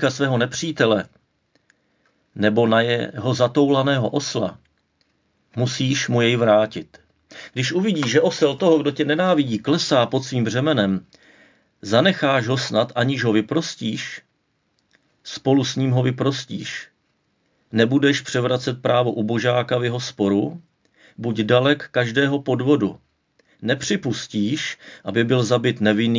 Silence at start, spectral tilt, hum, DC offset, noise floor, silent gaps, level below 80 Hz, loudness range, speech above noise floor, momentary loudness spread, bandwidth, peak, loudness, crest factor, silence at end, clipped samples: 0 s; -5.5 dB/octave; none; under 0.1%; -69 dBFS; none; -60 dBFS; 4 LU; 49 dB; 11 LU; 7.6 kHz; -2 dBFS; -20 LUFS; 20 dB; 0 s; under 0.1%